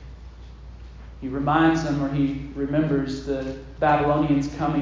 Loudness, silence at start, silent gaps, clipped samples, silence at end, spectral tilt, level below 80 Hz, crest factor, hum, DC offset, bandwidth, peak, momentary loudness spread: -23 LUFS; 0 s; none; under 0.1%; 0 s; -7.5 dB/octave; -40 dBFS; 18 dB; none; under 0.1%; 7.6 kHz; -6 dBFS; 24 LU